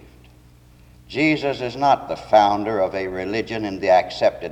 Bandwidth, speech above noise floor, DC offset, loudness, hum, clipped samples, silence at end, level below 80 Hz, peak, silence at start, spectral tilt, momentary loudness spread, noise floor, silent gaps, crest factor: 10 kHz; 29 dB; under 0.1%; -20 LUFS; none; under 0.1%; 0 s; -50 dBFS; -4 dBFS; 1.1 s; -5.5 dB/octave; 9 LU; -49 dBFS; none; 18 dB